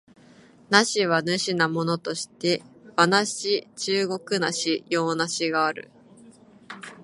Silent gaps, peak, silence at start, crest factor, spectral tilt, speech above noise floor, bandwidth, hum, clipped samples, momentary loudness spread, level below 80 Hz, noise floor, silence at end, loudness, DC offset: none; -2 dBFS; 0.7 s; 24 dB; -3.5 dB/octave; 28 dB; 11.5 kHz; none; under 0.1%; 10 LU; -74 dBFS; -52 dBFS; 0 s; -24 LUFS; under 0.1%